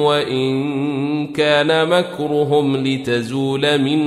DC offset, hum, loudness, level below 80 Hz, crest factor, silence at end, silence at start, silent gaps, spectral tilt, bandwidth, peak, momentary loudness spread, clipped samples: under 0.1%; none; -17 LUFS; -58 dBFS; 14 dB; 0 s; 0 s; none; -6 dB/octave; 14 kHz; -2 dBFS; 6 LU; under 0.1%